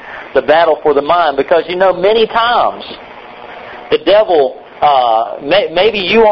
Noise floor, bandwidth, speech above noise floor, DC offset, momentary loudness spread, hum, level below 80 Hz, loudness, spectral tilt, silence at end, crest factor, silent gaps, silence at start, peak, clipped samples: -31 dBFS; 6 kHz; 21 dB; under 0.1%; 19 LU; none; -44 dBFS; -11 LUFS; -6 dB/octave; 0 s; 12 dB; none; 0 s; 0 dBFS; under 0.1%